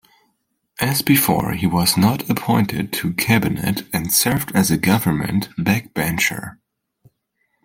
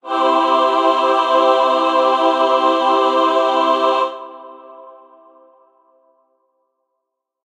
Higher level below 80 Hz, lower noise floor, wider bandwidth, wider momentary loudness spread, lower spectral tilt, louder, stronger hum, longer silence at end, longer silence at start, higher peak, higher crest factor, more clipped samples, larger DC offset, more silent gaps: first, -48 dBFS vs -74 dBFS; second, -70 dBFS vs -77 dBFS; first, 17 kHz vs 10.5 kHz; first, 7 LU vs 3 LU; first, -4.5 dB/octave vs -1.5 dB/octave; second, -18 LUFS vs -15 LUFS; neither; second, 1.15 s vs 2.55 s; first, 0.8 s vs 0.05 s; about the same, 0 dBFS vs -2 dBFS; about the same, 20 dB vs 16 dB; neither; neither; neither